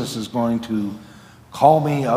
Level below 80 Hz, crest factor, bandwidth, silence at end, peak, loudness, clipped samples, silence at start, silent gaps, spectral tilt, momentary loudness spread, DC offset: -58 dBFS; 20 dB; 16 kHz; 0 s; 0 dBFS; -19 LUFS; under 0.1%; 0 s; none; -6.5 dB/octave; 19 LU; under 0.1%